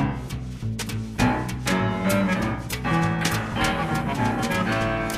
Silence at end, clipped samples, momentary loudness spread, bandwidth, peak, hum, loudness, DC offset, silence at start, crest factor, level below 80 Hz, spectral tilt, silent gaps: 0 s; under 0.1%; 7 LU; 15.5 kHz; -6 dBFS; none; -24 LUFS; under 0.1%; 0 s; 18 dB; -38 dBFS; -5 dB/octave; none